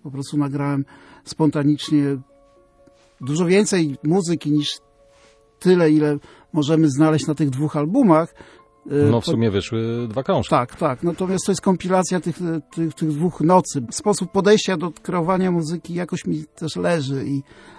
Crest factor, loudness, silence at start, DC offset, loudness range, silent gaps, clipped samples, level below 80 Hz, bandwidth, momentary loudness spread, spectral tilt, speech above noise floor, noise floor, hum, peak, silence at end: 18 dB; -20 LUFS; 0.05 s; under 0.1%; 3 LU; none; under 0.1%; -54 dBFS; 11 kHz; 10 LU; -6 dB/octave; 34 dB; -54 dBFS; none; -2 dBFS; 0.35 s